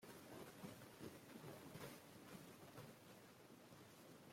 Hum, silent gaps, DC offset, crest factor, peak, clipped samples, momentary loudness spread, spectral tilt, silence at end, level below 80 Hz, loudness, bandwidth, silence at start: none; none; under 0.1%; 18 dB; -42 dBFS; under 0.1%; 6 LU; -4.5 dB/octave; 0 s; -86 dBFS; -60 LUFS; 16.5 kHz; 0 s